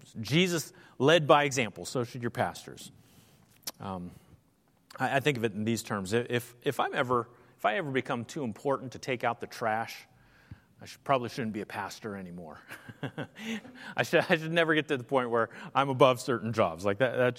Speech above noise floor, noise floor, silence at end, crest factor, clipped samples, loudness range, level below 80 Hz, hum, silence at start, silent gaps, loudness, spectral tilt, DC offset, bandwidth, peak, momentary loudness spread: 38 dB; -68 dBFS; 0 s; 24 dB; under 0.1%; 9 LU; -70 dBFS; none; 0.15 s; none; -30 LUFS; -5 dB/octave; under 0.1%; 16.5 kHz; -6 dBFS; 18 LU